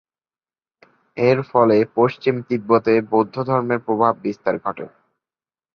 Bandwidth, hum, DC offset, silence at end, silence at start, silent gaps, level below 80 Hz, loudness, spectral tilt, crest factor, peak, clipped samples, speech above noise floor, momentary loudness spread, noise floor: 6.4 kHz; none; under 0.1%; 0.9 s; 1.15 s; none; -62 dBFS; -19 LUFS; -8.5 dB/octave; 18 dB; -2 dBFS; under 0.1%; over 72 dB; 10 LU; under -90 dBFS